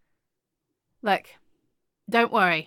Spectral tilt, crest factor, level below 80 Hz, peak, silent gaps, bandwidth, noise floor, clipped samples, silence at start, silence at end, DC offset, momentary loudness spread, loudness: -5 dB/octave; 22 dB; -78 dBFS; -6 dBFS; none; 17.5 kHz; -82 dBFS; under 0.1%; 1.05 s; 0.05 s; under 0.1%; 8 LU; -24 LUFS